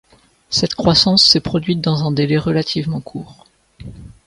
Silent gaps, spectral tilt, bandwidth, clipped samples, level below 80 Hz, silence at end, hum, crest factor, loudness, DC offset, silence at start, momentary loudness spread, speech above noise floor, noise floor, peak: none; -5 dB/octave; 11.5 kHz; under 0.1%; -42 dBFS; 0.2 s; none; 18 dB; -15 LUFS; under 0.1%; 0.5 s; 21 LU; 21 dB; -37 dBFS; 0 dBFS